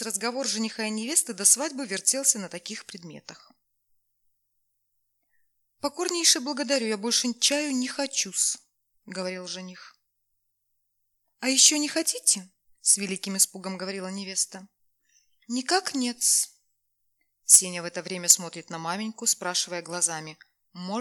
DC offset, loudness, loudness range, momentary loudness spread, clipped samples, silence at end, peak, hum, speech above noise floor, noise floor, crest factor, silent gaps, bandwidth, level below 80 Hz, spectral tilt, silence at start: under 0.1%; -24 LUFS; 8 LU; 17 LU; under 0.1%; 0 s; -4 dBFS; none; 50 dB; -76 dBFS; 24 dB; none; 19 kHz; -84 dBFS; -1 dB/octave; 0 s